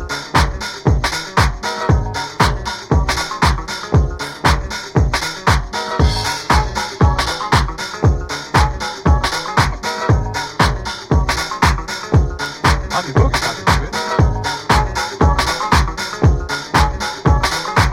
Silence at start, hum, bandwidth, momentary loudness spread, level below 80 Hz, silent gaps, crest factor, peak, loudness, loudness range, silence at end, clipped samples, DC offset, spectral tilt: 0 s; none; 16 kHz; 5 LU; -22 dBFS; none; 16 dB; 0 dBFS; -17 LUFS; 1 LU; 0 s; under 0.1%; under 0.1%; -4.5 dB/octave